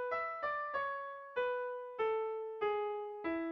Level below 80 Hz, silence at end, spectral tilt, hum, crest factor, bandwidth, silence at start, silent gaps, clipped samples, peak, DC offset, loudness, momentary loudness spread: -76 dBFS; 0 s; -1.5 dB/octave; none; 14 dB; 5.8 kHz; 0 s; none; under 0.1%; -26 dBFS; under 0.1%; -38 LUFS; 5 LU